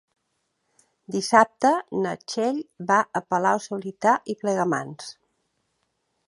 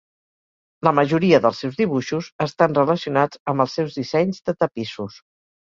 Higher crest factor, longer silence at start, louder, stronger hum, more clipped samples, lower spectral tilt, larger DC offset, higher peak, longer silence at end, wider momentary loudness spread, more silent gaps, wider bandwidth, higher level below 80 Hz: about the same, 24 dB vs 20 dB; first, 1.1 s vs 0.85 s; second, -23 LUFS vs -20 LUFS; neither; neither; second, -4.5 dB/octave vs -6.5 dB/octave; neither; about the same, -2 dBFS vs -2 dBFS; first, 1.15 s vs 0.65 s; about the same, 12 LU vs 11 LU; second, none vs 2.32-2.39 s, 3.39-3.46 s; first, 11.5 kHz vs 7.6 kHz; second, -72 dBFS vs -60 dBFS